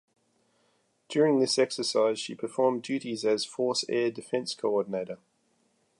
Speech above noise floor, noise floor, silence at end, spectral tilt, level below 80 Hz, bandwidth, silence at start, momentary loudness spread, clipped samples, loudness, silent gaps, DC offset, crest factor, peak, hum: 43 dB; -71 dBFS; 0.85 s; -4 dB/octave; -82 dBFS; 11.5 kHz; 1.1 s; 9 LU; under 0.1%; -28 LUFS; none; under 0.1%; 18 dB; -12 dBFS; none